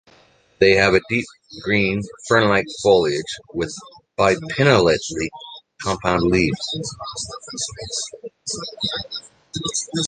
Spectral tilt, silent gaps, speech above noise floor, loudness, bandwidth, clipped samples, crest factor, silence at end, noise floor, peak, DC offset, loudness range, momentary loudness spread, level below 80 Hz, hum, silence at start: -4 dB/octave; none; 34 dB; -20 LUFS; 10 kHz; under 0.1%; 20 dB; 0 s; -55 dBFS; 0 dBFS; under 0.1%; 6 LU; 15 LU; -46 dBFS; none; 0.6 s